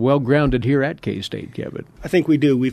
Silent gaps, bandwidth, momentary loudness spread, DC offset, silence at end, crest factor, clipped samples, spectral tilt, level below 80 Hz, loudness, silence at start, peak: none; 13.5 kHz; 14 LU; under 0.1%; 0 s; 16 dB; under 0.1%; -7.5 dB/octave; -38 dBFS; -19 LUFS; 0 s; -2 dBFS